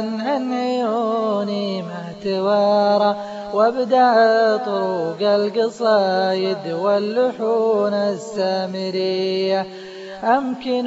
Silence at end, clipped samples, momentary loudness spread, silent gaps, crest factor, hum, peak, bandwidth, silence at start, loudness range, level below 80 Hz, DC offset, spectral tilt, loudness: 0 s; under 0.1%; 8 LU; none; 14 dB; none; -4 dBFS; 8 kHz; 0 s; 3 LU; -64 dBFS; under 0.1%; -6 dB/octave; -19 LUFS